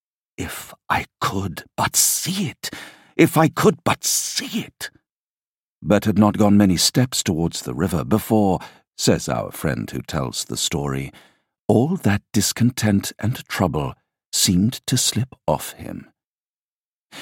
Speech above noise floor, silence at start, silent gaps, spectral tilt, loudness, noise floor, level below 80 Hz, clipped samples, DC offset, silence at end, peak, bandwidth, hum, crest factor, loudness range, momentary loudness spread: over 70 dB; 0.4 s; 5.12-5.81 s, 8.87-8.91 s, 11.61-11.69 s, 14.26-14.32 s, 16.24-17.10 s; -4 dB/octave; -20 LUFS; under -90 dBFS; -48 dBFS; under 0.1%; under 0.1%; 0 s; -2 dBFS; 17 kHz; none; 20 dB; 4 LU; 15 LU